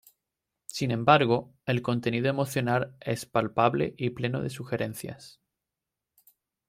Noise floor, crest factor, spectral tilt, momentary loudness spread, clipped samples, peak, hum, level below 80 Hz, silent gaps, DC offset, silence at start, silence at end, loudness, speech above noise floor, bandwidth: -88 dBFS; 24 dB; -6 dB/octave; 13 LU; under 0.1%; -6 dBFS; none; -64 dBFS; none; under 0.1%; 0.75 s; 1.4 s; -27 LUFS; 60 dB; 16 kHz